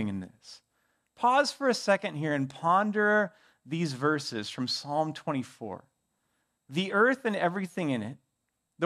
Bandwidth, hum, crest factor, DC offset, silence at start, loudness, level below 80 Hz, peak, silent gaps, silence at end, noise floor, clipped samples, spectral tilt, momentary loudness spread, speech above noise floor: 14 kHz; none; 20 dB; under 0.1%; 0 s; -29 LUFS; -80 dBFS; -10 dBFS; none; 0 s; -81 dBFS; under 0.1%; -5 dB/octave; 13 LU; 52 dB